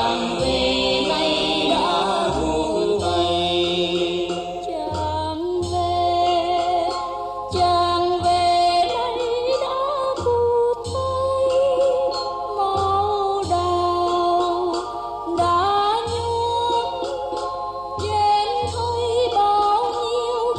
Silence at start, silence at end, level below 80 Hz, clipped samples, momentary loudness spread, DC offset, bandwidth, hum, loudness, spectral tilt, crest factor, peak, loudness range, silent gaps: 0 s; 0 s; -44 dBFS; under 0.1%; 8 LU; under 0.1%; 10.5 kHz; none; -21 LUFS; -4.5 dB/octave; 12 dB; -8 dBFS; 2 LU; none